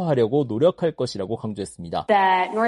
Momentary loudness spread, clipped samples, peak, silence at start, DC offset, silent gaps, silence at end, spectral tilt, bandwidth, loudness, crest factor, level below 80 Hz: 11 LU; under 0.1%; -6 dBFS; 0 s; under 0.1%; none; 0 s; -6.5 dB/octave; 11.5 kHz; -22 LUFS; 16 dB; -58 dBFS